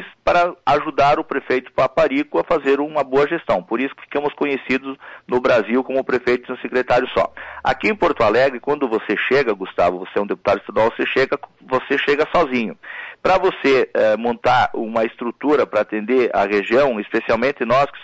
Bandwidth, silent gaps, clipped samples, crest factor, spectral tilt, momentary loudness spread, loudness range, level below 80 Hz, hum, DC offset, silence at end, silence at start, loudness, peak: 7.8 kHz; none; under 0.1%; 12 dB; -6 dB/octave; 7 LU; 2 LU; -48 dBFS; none; under 0.1%; 0 s; 0 s; -19 LUFS; -8 dBFS